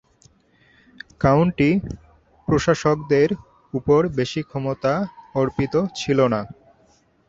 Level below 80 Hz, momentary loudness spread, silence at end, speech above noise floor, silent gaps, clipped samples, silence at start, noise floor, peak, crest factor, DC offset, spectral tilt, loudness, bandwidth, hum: -46 dBFS; 12 LU; 0.75 s; 39 dB; none; under 0.1%; 1.2 s; -59 dBFS; -2 dBFS; 18 dB; under 0.1%; -7 dB/octave; -21 LUFS; 7.8 kHz; none